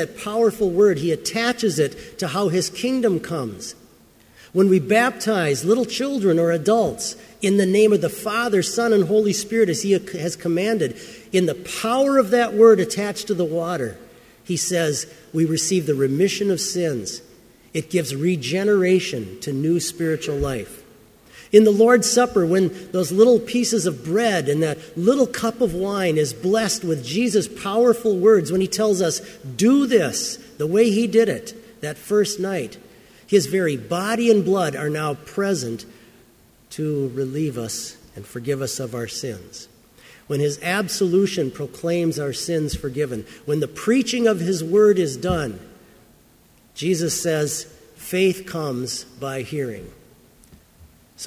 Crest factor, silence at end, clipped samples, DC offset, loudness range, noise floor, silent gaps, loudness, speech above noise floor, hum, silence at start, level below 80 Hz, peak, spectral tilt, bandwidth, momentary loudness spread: 20 dB; 0 s; under 0.1%; under 0.1%; 7 LU; -54 dBFS; none; -20 LUFS; 34 dB; none; 0 s; -50 dBFS; 0 dBFS; -5 dB/octave; 16 kHz; 12 LU